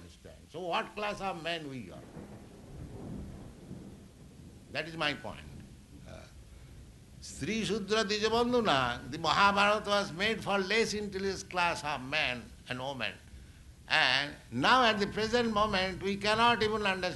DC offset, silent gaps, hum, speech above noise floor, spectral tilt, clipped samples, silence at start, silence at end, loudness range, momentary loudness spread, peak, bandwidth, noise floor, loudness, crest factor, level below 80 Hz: under 0.1%; none; none; 22 dB; -4 dB/octave; under 0.1%; 0 s; 0 s; 12 LU; 23 LU; -10 dBFS; 12 kHz; -53 dBFS; -30 LUFS; 24 dB; -54 dBFS